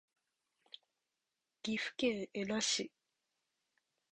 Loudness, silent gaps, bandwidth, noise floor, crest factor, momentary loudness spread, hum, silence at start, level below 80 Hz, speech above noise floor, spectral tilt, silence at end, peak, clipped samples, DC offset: -37 LUFS; none; 10 kHz; -89 dBFS; 20 dB; 22 LU; none; 1.65 s; -78 dBFS; 51 dB; -2.5 dB/octave; 1.25 s; -22 dBFS; under 0.1%; under 0.1%